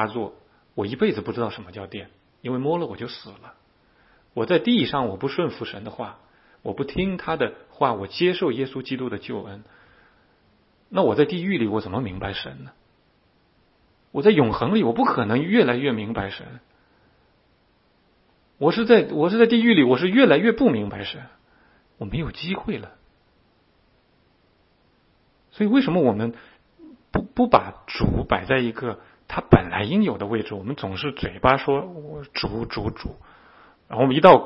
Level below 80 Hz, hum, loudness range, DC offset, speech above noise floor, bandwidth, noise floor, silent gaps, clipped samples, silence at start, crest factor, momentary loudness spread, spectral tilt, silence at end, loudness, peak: -46 dBFS; none; 9 LU; under 0.1%; 41 dB; 5.8 kHz; -62 dBFS; none; under 0.1%; 0 s; 24 dB; 18 LU; -9.5 dB/octave; 0 s; -22 LUFS; 0 dBFS